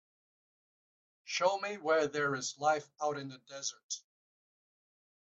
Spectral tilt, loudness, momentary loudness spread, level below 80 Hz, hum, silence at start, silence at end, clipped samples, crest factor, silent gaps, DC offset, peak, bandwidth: -2.5 dB/octave; -34 LUFS; 12 LU; -84 dBFS; none; 1.25 s; 1.35 s; under 0.1%; 20 dB; 3.83-3.89 s; under 0.1%; -16 dBFS; 8.2 kHz